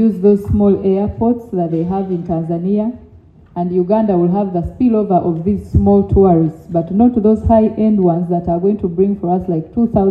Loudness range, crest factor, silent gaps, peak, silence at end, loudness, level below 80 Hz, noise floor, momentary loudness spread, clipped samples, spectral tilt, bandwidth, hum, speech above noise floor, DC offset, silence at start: 4 LU; 14 dB; none; 0 dBFS; 0 s; -15 LUFS; -34 dBFS; -42 dBFS; 7 LU; under 0.1%; -11.5 dB/octave; 4.1 kHz; none; 29 dB; under 0.1%; 0 s